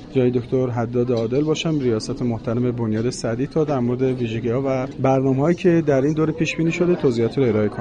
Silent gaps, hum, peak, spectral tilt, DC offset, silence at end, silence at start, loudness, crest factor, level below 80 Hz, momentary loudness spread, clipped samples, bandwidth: none; none; -6 dBFS; -7 dB/octave; under 0.1%; 0 s; 0 s; -20 LUFS; 12 dB; -46 dBFS; 5 LU; under 0.1%; 10 kHz